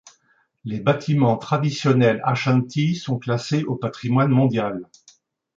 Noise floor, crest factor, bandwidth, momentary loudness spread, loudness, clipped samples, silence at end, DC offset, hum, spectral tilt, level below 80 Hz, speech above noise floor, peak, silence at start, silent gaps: -64 dBFS; 16 dB; 7.6 kHz; 9 LU; -21 LUFS; under 0.1%; 0.75 s; under 0.1%; none; -7 dB/octave; -60 dBFS; 43 dB; -4 dBFS; 0.65 s; none